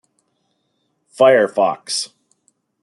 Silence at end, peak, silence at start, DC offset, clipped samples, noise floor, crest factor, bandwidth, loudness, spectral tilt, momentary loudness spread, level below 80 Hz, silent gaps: 0.75 s; -2 dBFS; 1.2 s; under 0.1%; under 0.1%; -69 dBFS; 18 dB; 12 kHz; -16 LUFS; -3 dB/octave; 11 LU; -72 dBFS; none